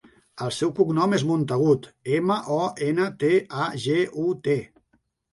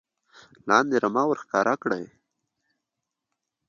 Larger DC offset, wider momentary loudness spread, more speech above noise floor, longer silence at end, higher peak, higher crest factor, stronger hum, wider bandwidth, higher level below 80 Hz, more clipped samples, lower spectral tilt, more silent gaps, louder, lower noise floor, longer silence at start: neither; second, 5 LU vs 14 LU; second, 46 dB vs 61 dB; second, 0.65 s vs 1.65 s; about the same, -6 dBFS vs -4 dBFS; second, 16 dB vs 24 dB; neither; first, 11.5 kHz vs 7.4 kHz; first, -64 dBFS vs -74 dBFS; neither; first, -6.5 dB/octave vs -5 dB/octave; neither; about the same, -24 LUFS vs -24 LUFS; second, -69 dBFS vs -84 dBFS; second, 0.35 s vs 0.65 s